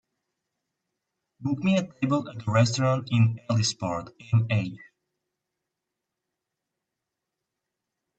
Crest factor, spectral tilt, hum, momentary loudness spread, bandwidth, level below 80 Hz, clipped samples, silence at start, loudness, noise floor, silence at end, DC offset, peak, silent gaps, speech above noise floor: 22 dB; -6 dB/octave; none; 9 LU; 8.6 kHz; -64 dBFS; under 0.1%; 1.4 s; -26 LUFS; -85 dBFS; 3.35 s; under 0.1%; -8 dBFS; none; 61 dB